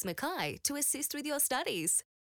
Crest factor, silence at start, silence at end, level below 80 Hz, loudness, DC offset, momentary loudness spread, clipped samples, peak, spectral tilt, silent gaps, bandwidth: 18 dB; 0 s; 0.25 s; -72 dBFS; -32 LUFS; under 0.1%; 5 LU; under 0.1%; -16 dBFS; -1.5 dB/octave; none; over 20 kHz